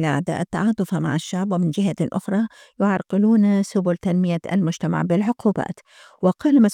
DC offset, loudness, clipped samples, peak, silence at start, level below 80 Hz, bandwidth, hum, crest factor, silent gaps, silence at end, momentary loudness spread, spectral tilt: under 0.1%; -21 LUFS; under 0.1%; -6 dBFS; 0 s; -60 dBFS; 12 kHz; none; 14 dB; none; 0 s; 7 LU; -7 dB/octave